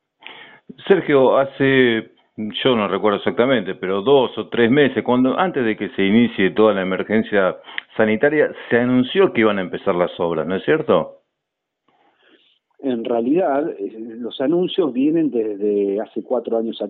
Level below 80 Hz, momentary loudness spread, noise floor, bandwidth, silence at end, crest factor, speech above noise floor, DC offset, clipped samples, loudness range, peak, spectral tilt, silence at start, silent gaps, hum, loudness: -58 dBFS; 10 LU; -79 dBFS; 4.2 kHz; 0 s; 18 dB; 61 dB; under 0.1%; under 0.1%; 6 LU; 0 dBFS; -4 dB/octave; 0.25 s; none; none; -18 LUFS